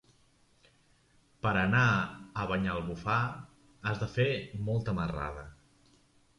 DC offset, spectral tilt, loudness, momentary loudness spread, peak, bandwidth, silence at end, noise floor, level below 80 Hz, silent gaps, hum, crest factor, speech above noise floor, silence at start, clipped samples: under 0.1%; -7 dB/octave; -32 LUFS; 12 LU; -14 dBFS; 11 kHz; 0.85 s; -66 dBFS; -52 dBFS; none; none; 20 dB; 35 dB; 1.45 s; under 0.1%